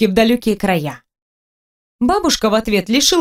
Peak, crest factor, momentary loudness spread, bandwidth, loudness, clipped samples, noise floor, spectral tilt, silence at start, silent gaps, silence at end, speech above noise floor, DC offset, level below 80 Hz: 0 dBFS; 16 dB; 7 LU; 16 kHz; -15 LUFS; under 0.1%; under -90 dBFS; -3.5 dB/octave; 0 s; 1.22-1.99 s; 0 s; over 75 dB; under 0.1%; -40 dBFS